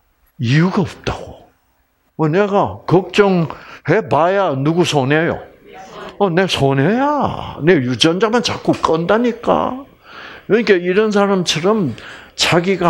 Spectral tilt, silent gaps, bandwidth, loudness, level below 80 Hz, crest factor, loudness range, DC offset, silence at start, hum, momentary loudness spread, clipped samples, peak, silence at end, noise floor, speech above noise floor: -5.5 dB/octave; none; 16 kHz; -15 LUFS; -46 dBFS; 16 dB; 2 LU; under 0.1%; 0.4 s; none; 13 LU; under 0.1%; 0 dBFS; 0 s; -60 dBFS; 46 dB